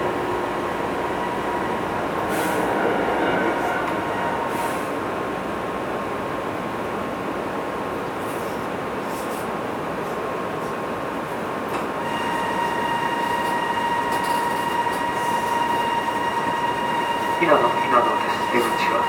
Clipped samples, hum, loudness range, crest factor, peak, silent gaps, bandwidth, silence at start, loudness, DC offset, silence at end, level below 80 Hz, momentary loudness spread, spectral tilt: under 0.1%; none; 6 LU; 20 dB; -2 dBFS; none; 19.5 kHz; 0 s; -23 LUFS; under 0.1%; 0 s; -52 dBFS; 7 LU; -4.5 dB/octave